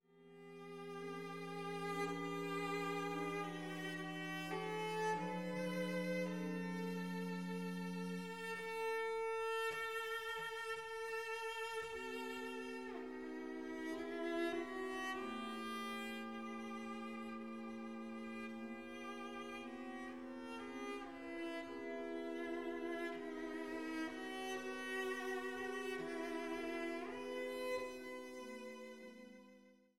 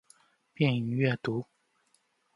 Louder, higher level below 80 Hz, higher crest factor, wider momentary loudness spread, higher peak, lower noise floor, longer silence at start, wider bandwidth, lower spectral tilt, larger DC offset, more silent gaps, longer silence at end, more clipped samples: second, -45 LUFS vs -30 LUFS; second, -76 dBFS vs -70 dBFS; about the same, 16 dB vs 20 dB; about the same, 8 LU vs 9 LU; second, -30 dBFS vs -12 dBFS; second, -66 dBFS vs -72 dBFS; second, 0 s vs 0.6 s; first, 17 kHz vs 11.5 kHz; second, -5 dB/octave vs -8 dB/octave; neither; neither; second, 0 s vs 0.95 s; neither